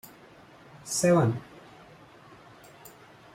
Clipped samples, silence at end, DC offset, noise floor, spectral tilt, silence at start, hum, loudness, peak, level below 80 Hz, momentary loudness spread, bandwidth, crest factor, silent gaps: under 0.1%; 0.45 s; under 0.1%; -53 dBFS; -5.5 dB/octave; 0.85 s; none; -26 LUFS; -12 dBFS; -66 dBFS; 28 LU; 16.5 kHz; 18 dB; none